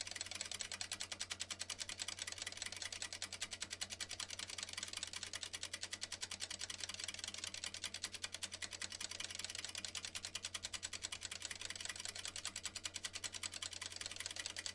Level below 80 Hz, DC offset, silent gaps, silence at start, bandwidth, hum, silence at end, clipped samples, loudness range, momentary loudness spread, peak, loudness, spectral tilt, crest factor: -74 dBFS; under 0.1%; none; 0 s; 11.5 kHz; none; 0 s; under 0.1%; 1 LU; 1 LU; -26 dBFS; -45 LUFS; 0.5 dB/octave; 22 dB